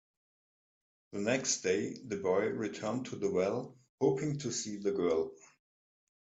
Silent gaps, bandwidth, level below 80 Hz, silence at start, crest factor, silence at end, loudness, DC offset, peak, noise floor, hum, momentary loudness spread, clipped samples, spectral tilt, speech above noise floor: 3.89-3.98 s; 8.4 kHz; -74 dBFS; 1.1 s; 20 dB; 1 s; -34 LUFS; under 0.1%; -16 dBFS; under -90 dBFS; none; 7 LU; under 0.1%; -4.5 dB/octave; over 57 dB